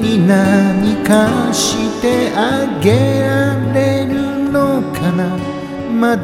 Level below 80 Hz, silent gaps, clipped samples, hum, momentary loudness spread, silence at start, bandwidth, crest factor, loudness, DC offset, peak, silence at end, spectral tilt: -42 dBFS; none; under 0.1%; none; 6 LU; 0 s; 16.5 kHz; 14 dB; -14 LUFS; under 0.1%; 0 dBFS; 0 s; -5.5 dB/octave